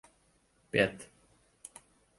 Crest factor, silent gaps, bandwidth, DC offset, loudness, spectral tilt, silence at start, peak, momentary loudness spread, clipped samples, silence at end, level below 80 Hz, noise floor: 26 dB; none; 11.5 kHz; under 0.1%; -31 LUFS; -4.5 dB/octave; 0.75 s; -12 dBFS; 24 LU; under 0.1%; 1.15 s; -66 dBFS; -70 dBFS